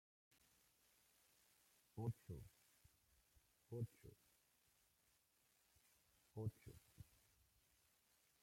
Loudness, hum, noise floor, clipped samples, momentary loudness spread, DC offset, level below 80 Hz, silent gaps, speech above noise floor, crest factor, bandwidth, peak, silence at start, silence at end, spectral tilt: -53 LUFS; none; -81 dBFS; under 0.1%; 17 LU; under 0.1%; -78 dBFS; none; 30 dB; 24 dB; 16.5 kHz; -36 dBFS; 1.95 s; 1.4 s; -7.5 dB/octave